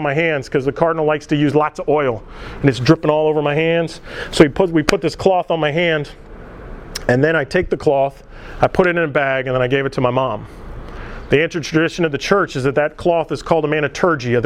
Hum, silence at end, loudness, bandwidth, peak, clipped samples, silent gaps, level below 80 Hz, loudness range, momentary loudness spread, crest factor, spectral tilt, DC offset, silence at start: none; 0 s; -17 LUFS; 15 kHz; 0 dBFS; under 0.1%; none; -38 dBFS; 2 LU; 14 LU; 16 dB; -6 dB/octave; under 0.1%; 0 s